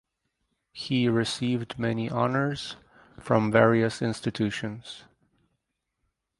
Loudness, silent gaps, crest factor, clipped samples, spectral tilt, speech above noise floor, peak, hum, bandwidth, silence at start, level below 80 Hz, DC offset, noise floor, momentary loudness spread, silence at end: -26 LUFS; none; 24 dB; under 0.1%; -6 dB/octave; 54 dB; -4 dBFS; none; 11.5 kHz; 0.75 s; -60 dBFS; under 0.1%; -80 dBFS; 21 LU; 1.4 s